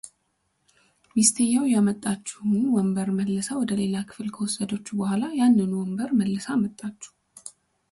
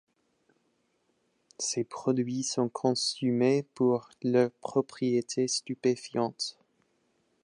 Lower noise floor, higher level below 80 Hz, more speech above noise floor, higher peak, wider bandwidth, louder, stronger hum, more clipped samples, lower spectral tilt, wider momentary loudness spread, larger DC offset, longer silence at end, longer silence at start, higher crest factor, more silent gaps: about the same, -73 dBFS vs -74 dBFS; first, -64 dBFS vs -80 dBFS; first, 49 dB vs 45 dB; first, -4 dBFS vs -12 dBFS; about the same, 11.5 kHz vs 11 kHz; first, -24 LUFS vs -29 LUFS; neither; neither; about the same, -5 dB/octave vs -4.5 dB/octave; first, 19 LU vs 5 LU; neither; second, 0.4 s vs 0.9 s; second, 0.05 s vs 1.6 s; about the same, 22 dB vs 18 dB; neither